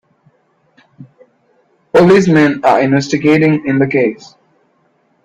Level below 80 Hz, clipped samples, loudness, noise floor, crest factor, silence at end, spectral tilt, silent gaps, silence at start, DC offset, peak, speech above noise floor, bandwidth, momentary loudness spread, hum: -52 dBFS; under 0.1%; -11 LUFS; -57 dBFS; 14 dB; 1.1 s; -7 dB/octave; none; 1 s; under 0.1%; 0 dBFS; 47 dB; 9.8 kHz; 6 LU; none